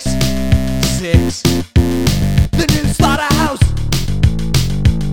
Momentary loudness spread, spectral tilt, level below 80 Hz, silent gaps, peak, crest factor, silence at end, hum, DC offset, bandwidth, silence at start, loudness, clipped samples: 3 LU; -5.5 dB/octave; -20 dBFS; none; 0 dBFS; 14 dB; 0 s; none; 6%; 18 kHz; 0 s; -15 LUFS; under 0.1%